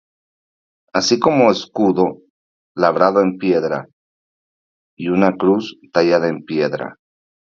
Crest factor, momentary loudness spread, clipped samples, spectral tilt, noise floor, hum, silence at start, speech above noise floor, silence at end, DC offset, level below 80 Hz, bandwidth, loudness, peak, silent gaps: 18 dB; 9 LU; under 0.1%; -5.5 dB/octave; under -90 dBFS; none; 0.95 s; over 74 dB; 0.65 s; under 0.1%; -58 dBFS; 7.6 kHz; -17 LUFS; 0 dBFS; 2.30-2.75 s, 3.93-4.97 s